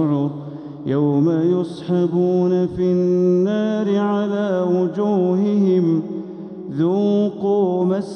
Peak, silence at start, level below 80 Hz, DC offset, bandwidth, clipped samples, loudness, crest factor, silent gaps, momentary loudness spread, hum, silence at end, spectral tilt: -8 dBFS; 0 s; -58 dBFS; under 0.1%; 6.6 kHz; under 0.1%; -19 LUFS; 10 dB; none; 10 LU; none; 0 s; -9 dB/octave